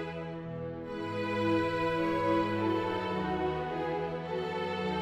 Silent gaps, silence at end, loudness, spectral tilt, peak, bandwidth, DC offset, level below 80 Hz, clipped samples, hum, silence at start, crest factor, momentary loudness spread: none; 0 s; -32 LUFS; -7 dB/octave; -16 dBFS; 12 kHz; under 0.1%; -58 dBFS; under 0.1%; none; 0 s; 16 dB; 10 LU